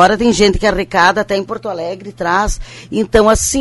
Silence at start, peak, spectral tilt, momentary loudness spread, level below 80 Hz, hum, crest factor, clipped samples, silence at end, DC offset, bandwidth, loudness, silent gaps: 0 s; 0 dBFS; -3.5 dB/octave; 12 LU; -28 dBFS; none; 14 dB; 0.1%; 0 s; under 0.1%; 12 kHz; -14 LUFS; none